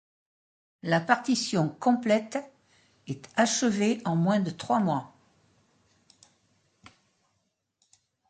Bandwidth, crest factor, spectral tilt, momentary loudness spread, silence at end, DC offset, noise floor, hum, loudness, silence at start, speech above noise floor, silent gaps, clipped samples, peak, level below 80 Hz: 9.4 kHz; 22 dB; -5 dB/octave; 12 LU; 3.2 s; under 0.1%; -77 dBFS; none; -27 LUFS; 0.85 s; 51 dB; none; under 0.1%; -6 dBFS; -72 dBFS